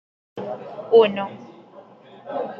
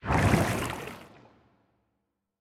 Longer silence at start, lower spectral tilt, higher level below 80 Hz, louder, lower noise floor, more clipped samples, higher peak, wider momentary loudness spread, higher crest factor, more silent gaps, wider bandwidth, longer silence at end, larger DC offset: first, 0.35 s vs 0.05 s; first, -7.5 dB/octave vs -5.5 dB/octave; second, -76 dBFS vs -42 dBFS; first, -21 LUFS vs -27 LUFS; second, -46 dBFS vs -81 dBFS; neither; first, -4 dBFS vs -10 dBFS; first, 25 LU vs 19 LU; about the same, 20 dB vs 20 dB; neither; second, 5 kHz vs 17 kHz; second, 0 s vs 1.35 s; neither